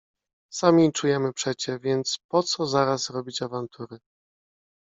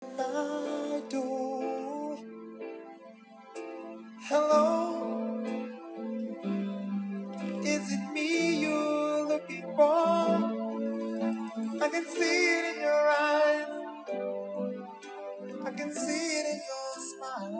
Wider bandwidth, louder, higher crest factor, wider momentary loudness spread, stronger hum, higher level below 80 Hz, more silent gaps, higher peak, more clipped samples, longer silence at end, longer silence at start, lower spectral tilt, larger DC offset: about the same, 8 kHz vs 8 kHz; first, -24 LUFS vs -30 LUFS; about the same, 22 dB vs 18 dB; about the same, 15 LU vs 17 LU; neither; first, -68 dBFS vs under -90 dBFS; first, 2.24-2.29 s vs none; first, -4 dBFS vs -12 dBFS; neither; first, 0.9 s vs 0 s; first, 0.5 s vs 0 s; about the same, -4.5 dB/octave vs -4.5 dB/octave; neither